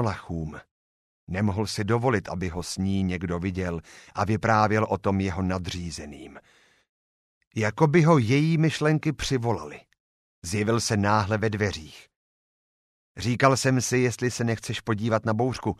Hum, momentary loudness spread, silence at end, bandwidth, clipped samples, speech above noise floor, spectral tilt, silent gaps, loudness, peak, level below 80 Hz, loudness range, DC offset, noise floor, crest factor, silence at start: none; 14 LU; 0.05 s; 14 kHz; under 0.1%; over 65 dB; -5.5 dB/octave; 0.71-1.27 s, 6.89-7.41 s, 7.47-7.51 s, 10.00-10.42 s, 12.16-13.15 s; -25 LUFS; -2 dBFS; -50 dBFS; 4 LU; under 0.1%; under -90 dBFS; 22 dB; 0 s